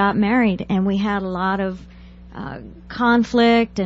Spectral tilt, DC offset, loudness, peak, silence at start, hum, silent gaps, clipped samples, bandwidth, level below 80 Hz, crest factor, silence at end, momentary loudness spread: -7 dB/octave; under 0.1%; -19 LUFS; -6 dBFS; 0 s; none; none; under 0.1%; 7.6 kHz; -44 dBFS; 14 dB; 0 s; 19 LU